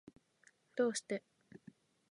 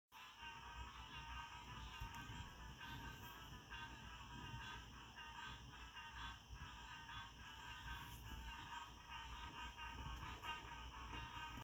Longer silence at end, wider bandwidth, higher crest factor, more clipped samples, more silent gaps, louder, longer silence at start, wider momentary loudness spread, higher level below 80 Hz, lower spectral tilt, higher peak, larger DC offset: first, 0.55 s vs 0 s; second, 11 kHz vs over 20 kHz; about the same, 20 dB vs 18 dB; neither; neither; first, -39 LUFS vs -54 LUFS; first, 0.75 s vs 0.1 s; first, 23 LU vs 4 LU; second, -88 dBFS vs -60 dBFS; about the same, -3.5 dB/octave vs -3.5 dB/octave; first, -22 dBFS vs -36 dBFS; neither